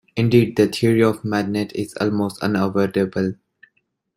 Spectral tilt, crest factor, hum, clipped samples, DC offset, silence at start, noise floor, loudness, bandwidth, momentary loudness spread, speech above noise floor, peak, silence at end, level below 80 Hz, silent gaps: -7 dB/octave; 18 dB; none; under 0.1%; under 0.1%; 0.15 s; -67 dBFS; -20 LUFS; 16 kHz; 8 LU; 48 dB; -2 dBFS; 0.8 s; -56 dBFS; none